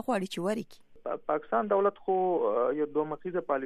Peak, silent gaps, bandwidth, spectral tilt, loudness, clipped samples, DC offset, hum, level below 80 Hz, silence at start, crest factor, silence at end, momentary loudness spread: -14 dBFS; none; 14 kHz; -6 dB/octave; -30 LUFS; under 0.1%; under 0.1%; none; -68 dBFS; 0 s; 16 dB; 0 s; 9 LU